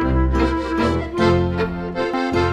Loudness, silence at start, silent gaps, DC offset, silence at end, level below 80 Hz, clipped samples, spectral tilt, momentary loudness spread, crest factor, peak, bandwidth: -20 LUFS; 0 s; none; under 0.1%; 0 s; -26 dBFS; under 0.1%; -7.5 dB/octave; 6 LU; 14 dB; -4 dBFS; 10 kHz